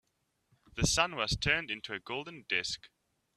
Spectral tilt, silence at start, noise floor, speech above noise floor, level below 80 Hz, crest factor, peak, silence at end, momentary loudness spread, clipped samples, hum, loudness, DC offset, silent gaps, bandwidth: -2.5 dB/octave; 0.75 s; -77 dBFS; 43 dB; -50 dBFS; 24 dB; -10 dBFS; 0.5 s; 12 LU; under 0.1%; none; -32 LUFS; under 0.1%; none; 14 kHz